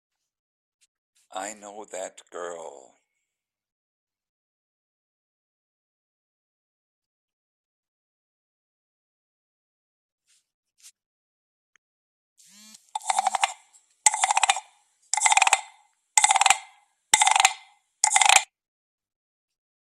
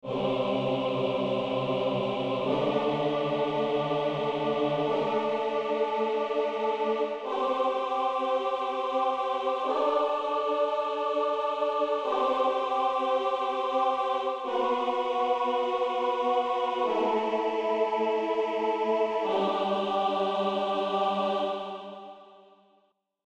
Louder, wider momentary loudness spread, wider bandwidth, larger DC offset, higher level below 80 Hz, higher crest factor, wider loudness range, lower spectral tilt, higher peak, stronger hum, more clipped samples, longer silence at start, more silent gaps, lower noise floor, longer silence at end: first, -21 LUFS vs -28 LUFS; first, 20 LU vs 2 LU; first, 15 kHz vs 9.2 kHz; neither; second, -84 dBFS vs -68 dBFS; first, 28 dB vs 14 dB; first, 21 LU vs 1 LU; second, 3.5 dB/octave vs -6 dB/octave; first, 0 dBFS vs -14 dBFS; neither; neither; first, 1.35 s vs 0.05 s; first, 3.72-4.07 s, 4.29-10.18 s, 10.54-10.63 s, 11.06-12.36 s vs none; first, -86 dBFS vs -69 dBFS; first, 1.45 s vs 0.9 s